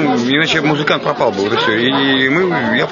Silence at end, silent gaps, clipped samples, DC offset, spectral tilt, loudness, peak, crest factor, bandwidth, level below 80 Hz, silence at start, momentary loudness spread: 0 s; none; under 0.1%; under 0.1%; -5 dB/octave; -13 LUFS; 0 dBFS; 14 dB; 7.4 kHz; -54 dBFS; 0 s; 3 LU